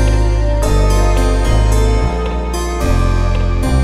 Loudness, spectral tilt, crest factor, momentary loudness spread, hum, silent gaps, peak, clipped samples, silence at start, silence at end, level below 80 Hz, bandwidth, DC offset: -15 LUFS; -6 dB/octave; 10 dB; 5 LU; none; none; -2 dBFS; under 0.1%; 0 s; 0 s; -14 dBFS; 14 kHz; under 0.1%